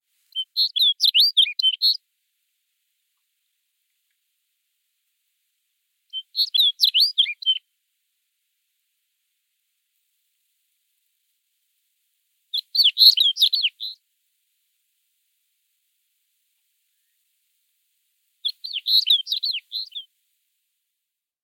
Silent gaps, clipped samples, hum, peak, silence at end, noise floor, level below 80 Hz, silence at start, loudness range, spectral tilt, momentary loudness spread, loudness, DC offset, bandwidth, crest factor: none; under 0.1%; none; -2 dBFS; 1.4 s; -83 dBFS; under -90 dBFS; 0.35 s; 15 LU; 10.5 dB/octave; 16 LU; -17 LUFS; under 0.1%; 16.5 kHz; 24 dB